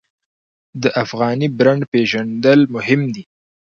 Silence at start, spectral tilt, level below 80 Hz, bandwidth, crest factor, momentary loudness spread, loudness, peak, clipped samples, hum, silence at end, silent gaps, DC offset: 0.75 s; -6.5 dB/octave; -60 dBFS; 7.2 kHz; 16 dB; 9 LU; -16 LUFS; 0 dBFS; under 0.1%; none; 0.55 s; 1.88-1.92 s; under 0.1%